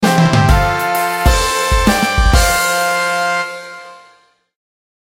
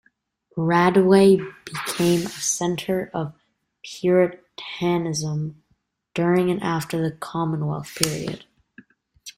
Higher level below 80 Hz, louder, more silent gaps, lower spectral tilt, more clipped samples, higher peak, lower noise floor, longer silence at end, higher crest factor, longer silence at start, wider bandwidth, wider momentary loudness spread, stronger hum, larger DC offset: first, -20 dBFS vs -58 dBFS; first, -13 LUFS vs -22 LUFS; neither; about the same, -4.5 dB/octave vs -5 dB/octave; neither; about the same, 0 dBFS vs 0 dBFS; second, -51 dBFS vs -69 dBFS; first, 1.2 s vs 0.05 s; second, 14 dB vs 22 dB; second, 0 s vs 0.55 s; about the same, 16.5 kHz vs 16.5 kHz; second, 9 LU vs 17 LU; neither; neither